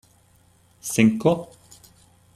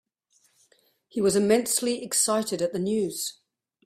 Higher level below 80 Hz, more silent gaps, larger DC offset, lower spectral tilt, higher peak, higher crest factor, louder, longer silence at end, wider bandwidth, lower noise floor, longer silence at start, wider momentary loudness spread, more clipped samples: first, -60 dBFS vs -66 dBFS; neither; neither; first, -5.5 dB/octave vs -3.5 dB/octave; first, -4 dBFS vs -8 dBFS; about the same, 22 dB vs 20 dB; first, -21 LUFS vs -25 LUFS; first, 0.9 s vs 0.55 s; second, 14.5 kHz vs 16 kHz; second, -58 dBFS vs -67 dBFS; second, 0.85 s vs 1.15 s; first, 18 LU vs 9 LU; neither